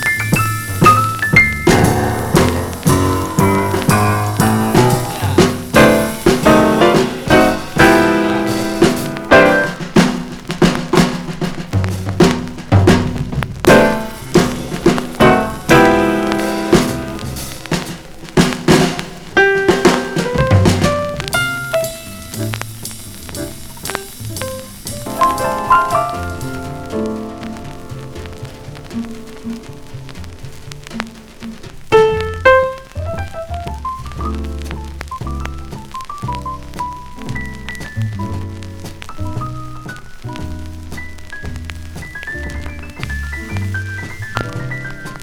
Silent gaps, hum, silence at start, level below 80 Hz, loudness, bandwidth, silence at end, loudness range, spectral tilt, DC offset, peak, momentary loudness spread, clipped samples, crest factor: none; none; 0 s; -32 dBFS; -15 LUFS; 19.5 kHz; 0 s; 15 LU; -5.5 dB/octave; under 0.1%; 0 dBFS; 19 LU; 0.1%; 16 dB